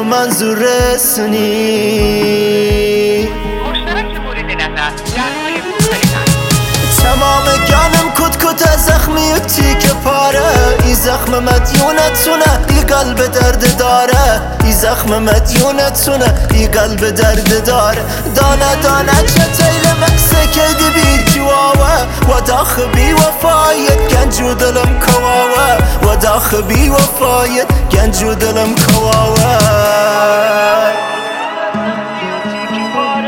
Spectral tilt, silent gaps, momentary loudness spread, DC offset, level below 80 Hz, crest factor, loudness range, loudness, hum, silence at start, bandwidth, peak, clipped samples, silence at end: -4 dB/octave; none; 7 LU; under 0.1%; -18 dBFS; 10 dB; 4 LU; -10 LUFS; none; 0 s; 19 kHz; 0 dBFS; under 0.1%; 0 s